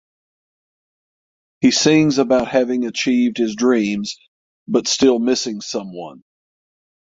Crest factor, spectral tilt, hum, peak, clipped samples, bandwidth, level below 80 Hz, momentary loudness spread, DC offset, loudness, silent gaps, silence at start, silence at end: 18 dB; -4 dB/octave; none; -2 dBFS; under 0.1%; 7.8 kHz; -58 dBFS; 14 LU; under 0.1%; -17 LUFS; 4.28-4.66 s; 1.6 s; 0.85 s